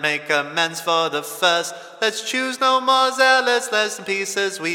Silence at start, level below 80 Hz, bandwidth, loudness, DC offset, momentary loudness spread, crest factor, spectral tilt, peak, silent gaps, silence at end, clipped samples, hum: 0 s; -82 dBFS; 17.5 kHz; -19 LUFS; under 0.1%; 7 LU; 18 dB; -1.5 dB/octave; -2 dBFS; none; 0 s; under 0.1%; none